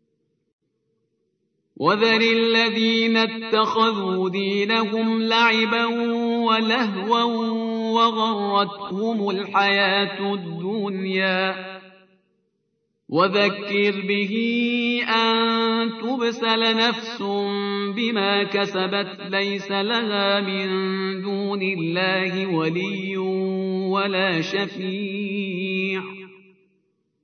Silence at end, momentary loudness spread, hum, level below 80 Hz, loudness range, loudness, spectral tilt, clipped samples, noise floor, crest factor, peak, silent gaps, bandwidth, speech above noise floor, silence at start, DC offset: 0.9 s; 8 LU; none; -80 dBFS; 4 LU; -21 LUFS; -5.5 dB/octave; under 0.1%; -73 dBFS; 18 dB; -6 dBFS; none; 6.6 kHz; 51 dB; 1.8 s; under 0.1%